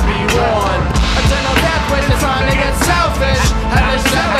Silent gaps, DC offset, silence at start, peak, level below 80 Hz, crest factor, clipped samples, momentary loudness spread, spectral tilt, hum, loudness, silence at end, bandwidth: none; under 0.1%; 0 s; 0 dBFS; -18 dBFS; 14 dB; under 0.1%; 2 LU; -4.5 dB/octave; none; -14 LUFS; 0 s; 15.5 kHz